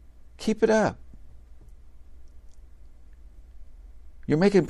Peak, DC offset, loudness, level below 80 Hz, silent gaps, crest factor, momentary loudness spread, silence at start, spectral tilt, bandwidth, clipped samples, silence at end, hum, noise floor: -8 dBFS; under 0.1%; -24 LUFS; -48 dBFS; none; 20 dB; 18 LU; 0.4 s; -6.5 dB/octave; 12 kHz; under 0.1%; 0 s; none; -46 dBFS